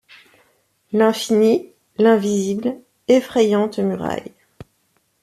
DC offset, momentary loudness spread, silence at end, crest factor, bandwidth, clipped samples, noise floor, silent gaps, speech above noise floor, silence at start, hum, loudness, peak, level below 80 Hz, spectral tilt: under 0.1%; 11 LU; 0.95 s; 16 dB; 14.5 kHz; under 0.1%; -65 dBFS; none; 48 dB; 0.9 s; none; -18 LUFS; -2 dBFS; -60 dBFS; -5.5 dB/octave